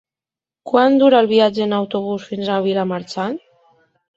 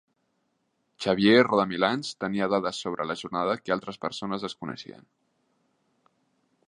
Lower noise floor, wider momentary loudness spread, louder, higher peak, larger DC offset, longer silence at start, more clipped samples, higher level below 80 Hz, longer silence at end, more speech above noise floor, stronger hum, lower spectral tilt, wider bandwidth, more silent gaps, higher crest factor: first, -90 dBFS vs -75 dBFS; second, 12 LU vs 15 LU; first, -17 LUFS vs -26 LUFS; first, -2 dBFS vs -6 dBFS; neither; second, 0.65 s vs 1 s; neither; about the same, -62 dBFS vs -66 dBFS; second, 0.8 s vs 1.85 s; first, 74 dB vs 48 dB; neither; about the same, -6.5 dB/octave vs -5.5 dB/octave; second, 7.8 kHz vs 11 kHz; neither; second, 16 dB vs 22 dB